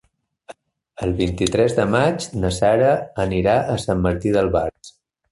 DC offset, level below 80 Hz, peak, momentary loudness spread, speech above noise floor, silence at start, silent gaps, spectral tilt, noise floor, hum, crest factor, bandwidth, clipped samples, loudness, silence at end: under 0.1%; -38 dBFS; -4 dBFS; 6 LU; 26 dB; 0.5 s; none; -6 dB/octave; -45 dBFS; none; 18 dB; 11.5 kHz; under 0.1%; -19 LUFS; 0.4 s